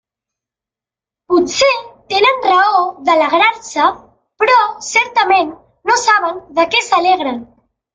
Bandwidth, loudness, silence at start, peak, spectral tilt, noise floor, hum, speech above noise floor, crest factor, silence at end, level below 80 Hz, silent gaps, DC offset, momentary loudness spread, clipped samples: 9.6 kHz; -13 LUFS; 1.3 s; 0 dBFS; -1.5 dB/octave; -88 dBFS; none; 75 dB; 14 dB; 0.5 s; -56 dBFS; none; under 0.1%; 8 LU; under 0.1%